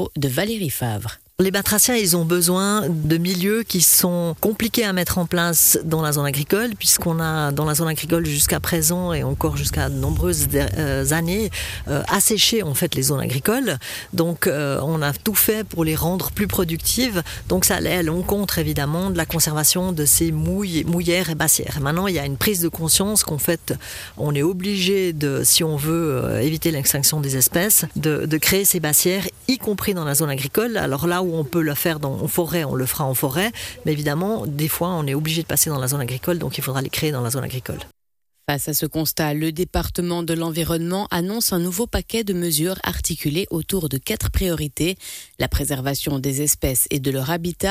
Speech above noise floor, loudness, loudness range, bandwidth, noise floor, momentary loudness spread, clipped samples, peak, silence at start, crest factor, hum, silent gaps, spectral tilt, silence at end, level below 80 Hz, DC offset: 49 dB; -20 LUFS; 5 LU; 16 kHz; -69 dBFS; 8 LU; under 0.1%; -4 dBFS; 0 s; 18 dB; none; none; -3.5 dB/octave; 0 s; -38 dBFS; under 0.1%